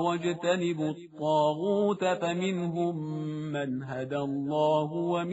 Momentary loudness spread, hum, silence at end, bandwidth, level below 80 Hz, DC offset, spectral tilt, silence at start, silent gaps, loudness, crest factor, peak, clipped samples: 8 LU; none; 0 s; 8 kHz; -72 dBFS; under 0.1%; -5.5 dB/octave; 0 s; none; -29 LUFS; 14 dB; -14 dBFS; under 0.1%